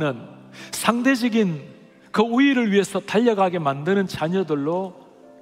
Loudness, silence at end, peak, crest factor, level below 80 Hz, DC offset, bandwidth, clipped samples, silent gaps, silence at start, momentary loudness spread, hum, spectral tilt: -21 LUFS; 0.5 s; 0 dBFS; 20 dB; -64 dBFS; under 0.1%; 16 kHz; under 0.1%; none; 0 s; 15 LU; none; -5.5 dB/octave